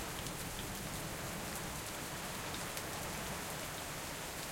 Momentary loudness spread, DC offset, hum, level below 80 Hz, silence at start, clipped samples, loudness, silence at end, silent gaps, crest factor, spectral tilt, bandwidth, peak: 1 LU; under 0.1%; none; -56 dBFS; 0 s; under 0.1%; -41 LUFS; 0 s; none; 24 dB; -3 dB/octave; 17 kHz; -18 dBFS